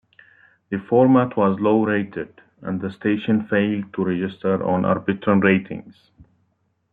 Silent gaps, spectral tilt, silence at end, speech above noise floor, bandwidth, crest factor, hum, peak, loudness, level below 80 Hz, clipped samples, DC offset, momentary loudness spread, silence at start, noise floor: none; -10.5 dB/octave; 1 s; 48 dB; 4.3 kHz; 18 dB; none; -2 dBFS; -20 LUFS; -62 dBFS; under 0.1%; under 0.1%; 14 LU; 0.7 s; -68 dBFS